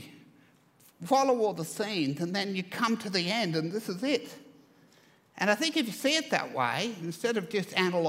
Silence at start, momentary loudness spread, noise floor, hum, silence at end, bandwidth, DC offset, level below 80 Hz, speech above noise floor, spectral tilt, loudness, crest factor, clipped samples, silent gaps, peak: 0 s; 7 LU; -62 dBFS; none; 0 s; 16 kHz; under 0.1%; -80 dBFS; 32 dB; -4 dB/octave; -29 LUFS; 22 dB; under 0.1%; none; -10 dBFS